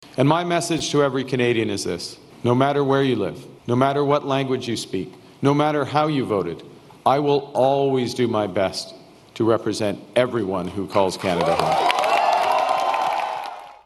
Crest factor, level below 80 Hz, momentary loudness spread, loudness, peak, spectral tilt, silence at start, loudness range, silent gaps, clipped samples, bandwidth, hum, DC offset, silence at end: 20 dB; -58 dBFS; 9 LU; -21 LUFS; -2 dBFS; -5.5 dB/octave; 0 s; 2 LU; none; under 0.1%; 12.5 kHz; none; under 0.1%; 0.15 s